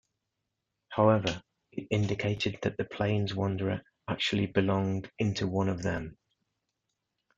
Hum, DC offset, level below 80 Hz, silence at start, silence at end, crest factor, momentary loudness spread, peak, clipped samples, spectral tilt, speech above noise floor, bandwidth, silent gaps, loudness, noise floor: none; under 0.1%; -60 dBFS; 0.9 s; 1.25 s; 22 dB; 11 LU; -10 dBFS; under 0.1%; -6.5 dB/octave; 55 dB; 7.8 kHz; none; -30 LUFS; -84 dBFS